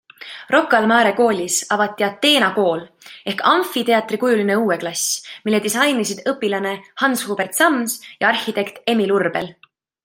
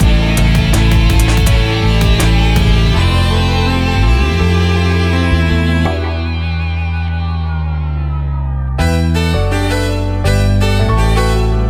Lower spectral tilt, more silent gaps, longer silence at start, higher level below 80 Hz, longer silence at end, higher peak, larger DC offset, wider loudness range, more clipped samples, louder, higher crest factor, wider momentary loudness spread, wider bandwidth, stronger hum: second, -3 dB/octave vs -6 dB/octave; neither; first, 0.2 s vs 0 s; second, -68 dBFS vs -16 dBFS; first, 0.55 s vs 0 s; about the same, -2 dBFS vs 0 dBFS; neither; second, 2 LU vs 5 LU; neither; second, -18 LUFS vs -13 LUFS; first, 18 dB vs 12 dB; about the same, 9 LU vs 7 LU; about the same, 16.5 kHz vs 15 kHz; neither